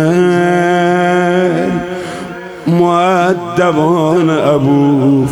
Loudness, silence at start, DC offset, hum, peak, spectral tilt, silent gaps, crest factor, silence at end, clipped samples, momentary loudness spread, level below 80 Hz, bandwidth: -11 LUFS; 0 s; 0.2%; none; 0 dBFS; -7 dB/octave; none; 10 dB; 0 s; under 0.1%; 11 LU; -50 dBFS; 19 kHz